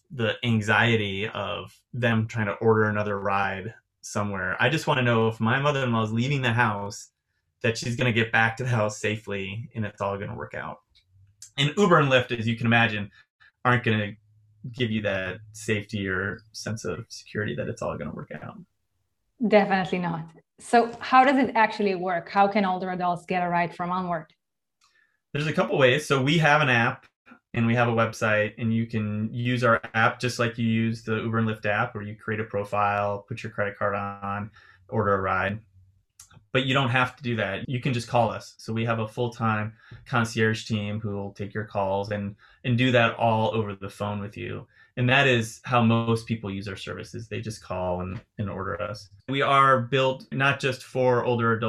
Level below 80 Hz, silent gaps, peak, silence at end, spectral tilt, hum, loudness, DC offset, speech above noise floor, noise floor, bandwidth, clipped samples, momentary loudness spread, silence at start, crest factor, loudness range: -60 dBFS; 13.30-13.39 s, 27.16-27.25 s; -4 dBFS; 0 s; -6 dB/octave; none; -25 LUFS; under 0.1%; 53 dB; -78 dBFS; 12.5 kHz; under 0.1%; 14 LU; 0.1 s; 22 dB; 6 LU